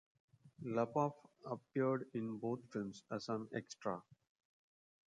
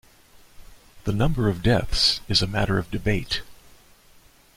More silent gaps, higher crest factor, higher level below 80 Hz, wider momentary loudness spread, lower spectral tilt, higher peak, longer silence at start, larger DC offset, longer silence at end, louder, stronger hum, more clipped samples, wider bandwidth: neither; about the same, 20 dB vs 18 dB; second, -82 dBFS vs -36 dBFS; about the same, 11 LU vs 10 LU; first, -7 dB/octave vs -5 dB/octave; second, -22 dBFS vs -6 dBFS; second, 0.45 s vs 0.6 s; neither; about the same, 0.95 s vs 1.05 s; second, -42 LUFS vs -23 LUFS; neither; neither; second, 10 kHz vs 16 kHz